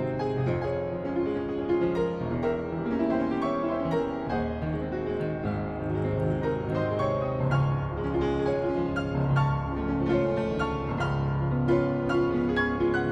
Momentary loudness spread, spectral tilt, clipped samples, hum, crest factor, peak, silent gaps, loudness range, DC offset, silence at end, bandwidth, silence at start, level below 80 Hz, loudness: 5 LU; -8.5 dB/octave; under 0.1%; none; 14 dB; -12 dBFS; none; 2 LU; under 0.1%; 0 s; 7.8 kHz; 0 s; -42 dBFS; -28 LUFS